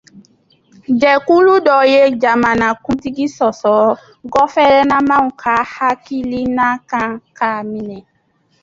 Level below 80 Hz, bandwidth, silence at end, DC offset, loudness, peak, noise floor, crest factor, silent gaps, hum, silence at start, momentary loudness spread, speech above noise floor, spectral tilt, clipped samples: -48 dBFS; 7.8 kHz; 0.6 s; under 0.1%; -14 LUFS; 0 dBFS; -59 dBFS; 14 dB; none; none; 0.15 s; 11 LU; 46 dB; -5.5 dB/octave; under 0.1%